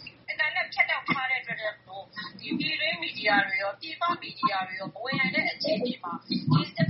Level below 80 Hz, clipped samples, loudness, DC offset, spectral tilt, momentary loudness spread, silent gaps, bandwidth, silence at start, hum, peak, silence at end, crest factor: -70 dBFS; under 0.1%; -28 LUFS; under 0.1%; -2.5 dB/octave; 11 LU; none; 6 kHz; 0 s; none; -10 dBFS; 0 s; 18 dB